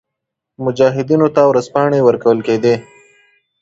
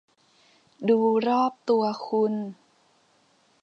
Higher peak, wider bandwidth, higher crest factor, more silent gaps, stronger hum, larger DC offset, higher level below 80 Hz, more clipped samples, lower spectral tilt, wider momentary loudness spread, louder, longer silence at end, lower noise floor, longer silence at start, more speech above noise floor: first, 0 dBFS vs -10 dBFS; first, 8 kHz vs 7 kHz; about the same, 14 dB vs 16 dB; neither; neither; neither; first, -56 dBFS vs -82 dBFS; neither; about the same, -7 dB/octave vs -7.5 dB/octave; second, 7 LU vs 10 LU; first, -14 LUFS vs -24 LUFS; second, 0.8 s vs 1.1 s; first, -79 dBFS vs -64 dBFS; second, 0.6 s vs 0.8 s; first, 66 dB vs 40 dB